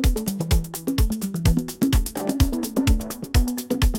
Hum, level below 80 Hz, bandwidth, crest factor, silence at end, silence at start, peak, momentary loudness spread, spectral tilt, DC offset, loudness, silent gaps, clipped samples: none; -24 dBFS; 17 kHz; 16 dB; 0 s; 0 s; -6 dBFS; 4 LU; -5.5 dB/octave; under 0.1%; -24 LUFS; none; under 0.1%